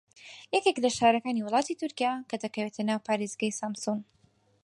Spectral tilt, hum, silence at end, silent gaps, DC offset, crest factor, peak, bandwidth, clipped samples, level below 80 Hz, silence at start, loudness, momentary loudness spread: -4 dB/octave; none; 0.6 s; none; under 0.1%; 20 dB; -10 dBFS; 11.5 kHz; under 0.1%; -72 dBFS; 0.2 s; -29 LUFS; 10 LU